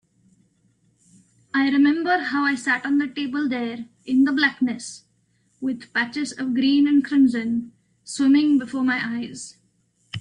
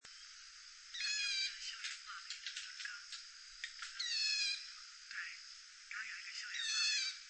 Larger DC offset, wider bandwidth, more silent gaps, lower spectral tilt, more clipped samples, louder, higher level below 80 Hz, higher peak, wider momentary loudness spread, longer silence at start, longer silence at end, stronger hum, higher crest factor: neither; first, 10 kHz vs 8.4 kHz; neither; first, -4 dB/octave vs 6.5 dB/octave; neither; first, -21 LUFS vs -40 LUFS; first, -68 dBFS vs -80 dBFS; first, -6 dBFS vs -24 dBFS; second, 15 LU vs 18 LU; first, 1.55 s vs 0.05 s; about the same, 0 s vs 0 s; neither; about the same, 16 dB vs 20 dB